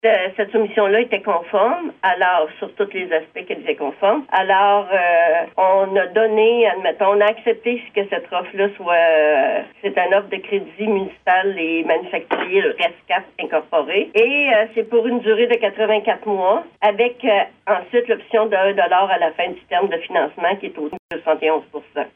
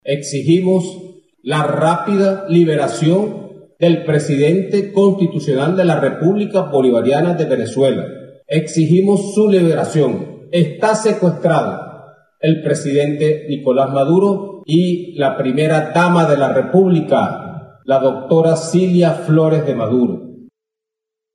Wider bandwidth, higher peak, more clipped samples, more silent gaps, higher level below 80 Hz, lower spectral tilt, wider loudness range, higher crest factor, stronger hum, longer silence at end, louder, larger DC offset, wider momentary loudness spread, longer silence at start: second, 3.8 kHz vs 11.5 kHz; second, -4 dBFS vs 0 dBFS; neither; first, 20.99-21.09 s vs none; about the same, -68 dBFS vs -70 dBFS; about the same, -6.5 dB/octave vs -7 dB/octave; about the same, 3 LU vs 2 LU; about the same, 14 dB vs 14 dB; neither; second, 0.1 s vs 0.9 s; second, -18 LUFS vs -15 LUFS; neither; about the same, 9 LU vs 7 LU; about the same, 0.05 s vs 0.05 s